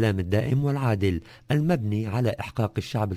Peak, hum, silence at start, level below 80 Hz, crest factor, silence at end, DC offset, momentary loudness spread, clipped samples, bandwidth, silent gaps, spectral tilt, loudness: -10 dBFS; none; 0 s; -42 dBFS; 16 dB; 0 s; under 0.1%; 5 LU; under 0.1%; 16 kHz; none; -7.5 dB/octave; -26 LUFS